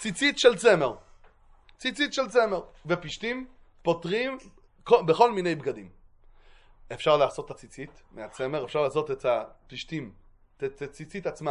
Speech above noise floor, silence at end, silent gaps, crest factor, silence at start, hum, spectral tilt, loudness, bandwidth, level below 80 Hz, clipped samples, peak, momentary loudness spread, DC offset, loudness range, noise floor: 30 dB; 0 s; none; 22 dB; 0 s; none; -4.5 dB/octave; -26 LUFS; 11 kHz; -58 dBFS; under 0.1%; -6 dBFS; 21 LU; under 0.1%; 6 LU; -56 dBFS